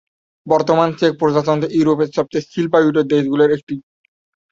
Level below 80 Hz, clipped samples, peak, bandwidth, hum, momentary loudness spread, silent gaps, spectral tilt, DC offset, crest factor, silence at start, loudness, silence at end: -56 dBFS; under 0.1%; 0 dBFS; 7.6 kHz; none; 7 LU; 3.63-3.67 s; -7 dB/octave; under 0.1%; 16 dB; 0.45 s; -16 LUFS; 0.7 s